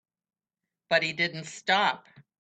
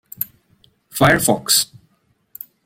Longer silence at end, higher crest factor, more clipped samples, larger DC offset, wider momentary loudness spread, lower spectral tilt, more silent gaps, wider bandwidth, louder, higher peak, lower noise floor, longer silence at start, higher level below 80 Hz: second, 0.45 s vs 1 s; about the same, 20 dB vs 20 dB; neither; neither; second, 8 LU vs 20 LU; about the same, -3 dB/octave vs -3 dB/octave; neither; second, 9.2 kHz vs 16.5 kHz; second, -27 LUFS vs -17 LUFS; second, -10 dBFS vs 0 dBFS; first, -89 dBFS vs -63 dBFS; first, 0.9 s vs 0.2 s; second, -78 dBFS vs -48 dBFS